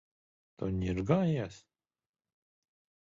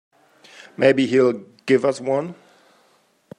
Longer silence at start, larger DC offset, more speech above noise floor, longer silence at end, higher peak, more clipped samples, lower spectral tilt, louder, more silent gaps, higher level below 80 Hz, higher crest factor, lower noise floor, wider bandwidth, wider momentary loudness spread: second, 0.6 s vs 0.8 s; neither; first, over 59 dB vs 42 dB; first, 1.45 s vs 1.05 s; second, -14 dBFS vs -2 dBFS; neither; first, -8 dB/octave vs -6 dB/octave; second, -32 LUFS vs -19 LUFS; neither; first, -52 dBFS vs -70 dBFS; about the same, 22 dB vs 20 dB; first, under -90 dBFS vs -60 dBFS; second, 7.6 kHz vs 10.5 kHz; second, 11 LU vs 15 LU